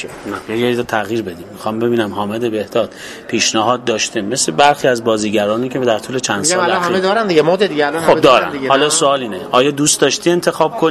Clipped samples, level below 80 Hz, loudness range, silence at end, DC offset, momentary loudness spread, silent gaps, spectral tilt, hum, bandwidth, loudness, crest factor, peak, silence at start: under 0.1%; -52 dBFS; 5 LU; 0 s; under 0.1%; 9 LU; none; -3 dB/octave; none; 15 kHz; -14 LUFS; 14 dB; 0 dBFS; 0 s